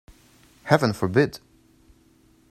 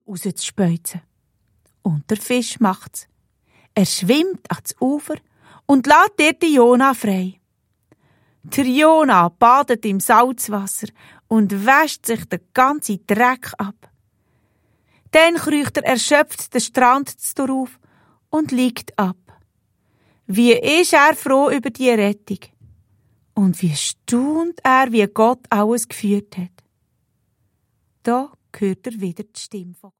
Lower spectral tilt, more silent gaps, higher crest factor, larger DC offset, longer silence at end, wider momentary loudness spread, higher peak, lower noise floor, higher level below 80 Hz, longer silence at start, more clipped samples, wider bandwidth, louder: first, -6.5 dB/octave vs -4.5 dB/octave; neither; first, 26 dB vs 18 dB; neither; first, 1.15 s vs 0.25 s; first, 21 LU vs 16 LU; about the same, 0 dBFS vs 0 dBFS; second, -58 dBFS vs -68 dBFS; first, -56 dBFS vs -62 dBFS; first, 0.65 s vs 0.1 s; neither; about the same, 15 kHz vs 16.5 kHz; second, -22 LUFS vs -17 LUFS